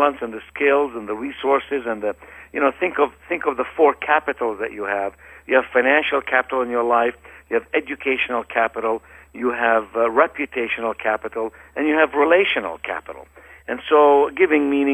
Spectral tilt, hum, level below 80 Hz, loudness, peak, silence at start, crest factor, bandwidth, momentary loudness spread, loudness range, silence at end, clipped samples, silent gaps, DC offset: -5 dB/octave; none; -54 dBFS; -20 LUFS; -2 dBFS; 0 s; 18 dB; 8.4 kHz; 12 LU; 3 LU; 0 s; under 0.1%; none; under 0.1%